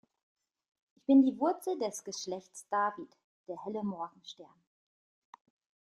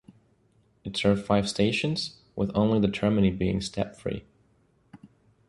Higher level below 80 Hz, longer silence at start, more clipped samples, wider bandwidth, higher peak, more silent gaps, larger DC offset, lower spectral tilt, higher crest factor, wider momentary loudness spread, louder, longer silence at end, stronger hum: second, -82 dBFS vs -50 dBFS; first, 1.1 s vs 0.85 s; neither; about the same, 12.5 kHz vs 11.5 kHz; second, -14 dBFS vs -8 dBFS; first, 3.24-3.44 s vs none; neither; second, -4.5 dB/octave vs -6 dB/octave; about the same, 20 dB vs 20 dB; first, 24 LU vs 11 LU; second, -32 LUFS vs -27 LUFS; first, 1.5 s vs 0.45 s; neither